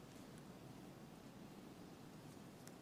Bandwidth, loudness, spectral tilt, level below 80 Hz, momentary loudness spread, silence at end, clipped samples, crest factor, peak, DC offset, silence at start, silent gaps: 19 kHz; -58 LUFS; -5.5 dB/octave; -76 dBFS; 1 LU; 0 s; under 0.1%; 22 dB; -36 dBFS; under 0.1%; 0 s; none